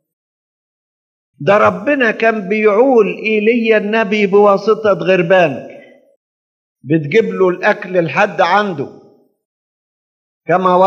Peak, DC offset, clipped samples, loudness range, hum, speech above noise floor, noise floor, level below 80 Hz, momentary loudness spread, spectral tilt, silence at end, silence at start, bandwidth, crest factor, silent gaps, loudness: 0 dBFS; under 0.1%; under 0.1%; 4 LU; none; over 78 dB; under -90 dBFS; -76 dBFS; 7 LU; -6.5 dB/octave; 0 s; 1.4 s; 7.2 kHz; 14 dB; 6.17-6.76 s, 9.45-10.41 s; -13 LUFS